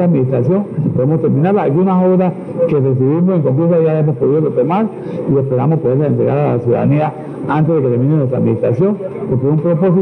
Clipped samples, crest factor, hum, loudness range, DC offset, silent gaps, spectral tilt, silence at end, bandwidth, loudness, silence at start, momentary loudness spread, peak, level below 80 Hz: under 0.1%; 8 dB; none; 2 LU; under 0.1%; none; -11.5 dB/octave; 0 s; 4.1 kHz; -14 LUFS; 0 s; 5 LU; -4 dBFS; -52 dBFS